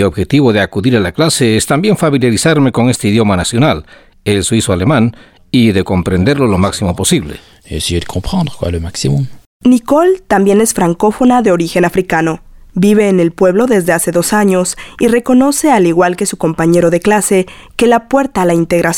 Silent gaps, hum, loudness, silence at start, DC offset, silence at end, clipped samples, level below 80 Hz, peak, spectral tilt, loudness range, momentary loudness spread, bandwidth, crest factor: 9.46-9.60 s; none; -11 LUFS; 0 s; under 0.1%; 0 s; under 0.1%; -36 dBFS; 0 dBFS; -5 dB/octave; 3 LU; 7 LU; 17.5 kHz; 10 dB